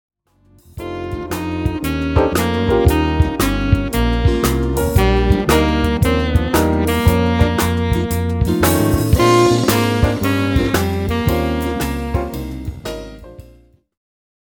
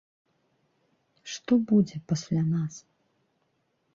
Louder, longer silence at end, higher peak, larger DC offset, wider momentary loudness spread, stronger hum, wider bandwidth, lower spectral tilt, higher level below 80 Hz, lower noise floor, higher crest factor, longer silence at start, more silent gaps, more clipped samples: first, -16 LUFS vs -27 LUFS; about the same, 1.1 s vs 1.15 s; first, 0 dBFS vs -12 dBFS; neither; second, 11 LU vs 18 LU; neither; first, over 20 kHz vs 7.6 kHz; about the same, -6 dB/octave vs -7 dB/octave; first, -24 dBFS vs -68 dBFS; second, -52 dBFS vs -74 dBFS; about the same, 16 dB vs 18 dB; second, 0.75 s vs 1.25 s; neither; neither